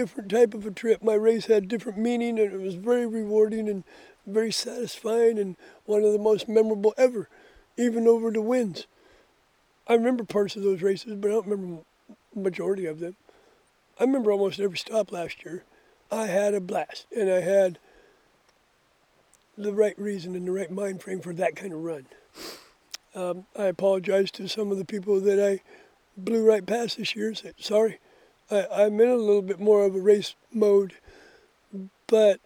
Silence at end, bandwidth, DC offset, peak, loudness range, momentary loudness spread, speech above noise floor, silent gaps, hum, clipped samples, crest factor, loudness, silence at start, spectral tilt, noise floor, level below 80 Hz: 0.1 s; 15.5 kHz; under 0.1%; -6 dBFS; 7 LU; 14 LU; 41 dB; none; none; under 0.1%; 18 dB; -25 LUFS; 0 s; -5.5 dB/octave; -65 dBFS; -70 dBFS